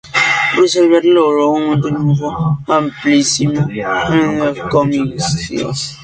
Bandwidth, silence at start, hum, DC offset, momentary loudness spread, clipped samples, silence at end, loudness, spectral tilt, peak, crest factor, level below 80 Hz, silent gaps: 9.4 kHz; 0.05 s; none; under 0.1%; 7 LU; under 0.1%; 0 s; -14 LUFS; -5 dB/octave; 0 dBFS; 14 dB; -44 dBFS; none